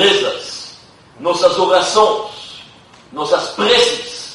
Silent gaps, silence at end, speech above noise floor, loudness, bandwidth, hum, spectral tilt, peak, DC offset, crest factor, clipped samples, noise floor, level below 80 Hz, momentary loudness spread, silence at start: none; 0 s; 29 dB; -15 LUFS; 11.5 kHz; none; -2 dB/octave; 0 dBFS; under 0.1%; 16 dB; under 0.1%; -43 dBFS; -56 dBFS; 20 LU; 0 s